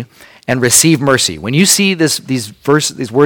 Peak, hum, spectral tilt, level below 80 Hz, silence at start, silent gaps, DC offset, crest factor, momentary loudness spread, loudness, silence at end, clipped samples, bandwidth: 0 dBFS; none; -3.5 dB/octave; -48 dBFS; 0 s; none; under 0.1%; 12 dB; 10 LU; -11 LUFS; 0 s; 0.2%; over 20 kHz